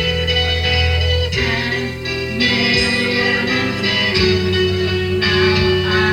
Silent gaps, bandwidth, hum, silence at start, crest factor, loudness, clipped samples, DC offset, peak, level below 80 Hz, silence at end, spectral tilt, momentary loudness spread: none; 15.5 kHz; none; 0 s; 14 dB; -15 LUFS; under 0.1%; under 0.1%; -2 dBFS; -30 dBFS; 0 s; -5 dB/octave; 5 LU